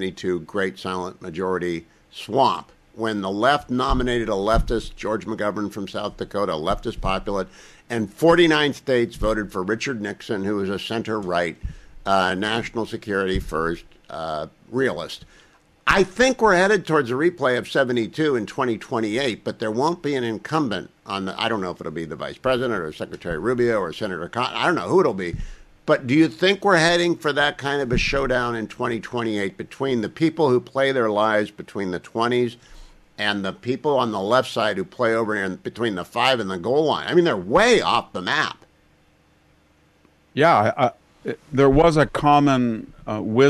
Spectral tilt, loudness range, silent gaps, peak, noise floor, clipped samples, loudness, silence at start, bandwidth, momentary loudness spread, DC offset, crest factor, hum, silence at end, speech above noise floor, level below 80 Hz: -5.5 dB/octave; 5 LU; none; -4 dBFS; -58 dBFS; under 0.1%; -22 LUFS; 0 s; 14 kHz; 12 LU; under 0.1%; 18 dB; none; 0 s; 37 dB; -40 dBFS